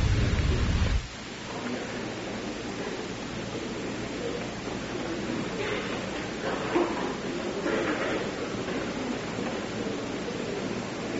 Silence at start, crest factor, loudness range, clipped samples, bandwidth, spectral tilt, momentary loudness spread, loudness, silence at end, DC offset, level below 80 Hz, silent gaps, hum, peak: 0 s; 18 dB; 4 LU; under 0.1%; 8 kHz; -4.5 dB/octave; 7 LU; -31 LUFS; 0 s; under 0.1%; -38 dBFS; none; none; -12 dBFS